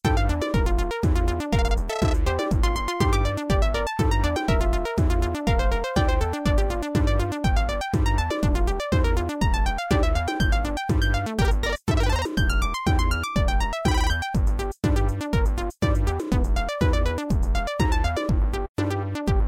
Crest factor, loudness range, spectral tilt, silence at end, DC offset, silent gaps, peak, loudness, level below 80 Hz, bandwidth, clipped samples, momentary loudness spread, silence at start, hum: 14 dB; 1 LU; -6 dB/octave; 0 s; 0.1%; 18.69-18.75 s; -8 dBFS; -24 LUFS; -24 dBFS; 15 kHz; under 0.1%; 2 LU; 0.05 s; none